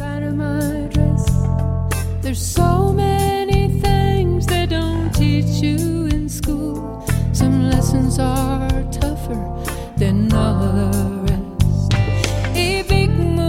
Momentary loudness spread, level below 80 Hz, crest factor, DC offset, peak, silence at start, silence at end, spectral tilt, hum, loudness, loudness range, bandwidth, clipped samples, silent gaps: 6 LU; -24 dBFS; 16 dB; under 0.1%; 0 dBFS; 0 s; 0 s; -6 dB/octave; none; -18 LUFS; 2 LU; 16.5 kHz; under 0.1%; none